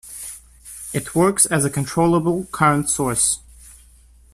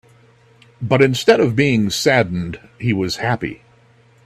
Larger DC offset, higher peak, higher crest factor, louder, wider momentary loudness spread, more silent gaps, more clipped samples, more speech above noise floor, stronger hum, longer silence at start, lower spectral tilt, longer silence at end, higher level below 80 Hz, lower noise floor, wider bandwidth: neither; about the same, 0 dBFS vs 0 dBFS; about the same, 20 dB vs 18 dB; about the same, -18 LUFS vs -17 LUFS; first, 18 LU vs 12 LU; neither; neither; second, 31 dB vs 35 dB; neither; second, 0.05 s vs 0.8 s; about the same, -4.5 dB/octave vs -5.5 dB/octave; about the same, 0.6 s vs 0.7 s; about the same, -48 dBFS vs -50 dBFS; about the same, -49 dBFS vs -51 dBFS; about the same, 15.5 kHz vs 14.5 kHz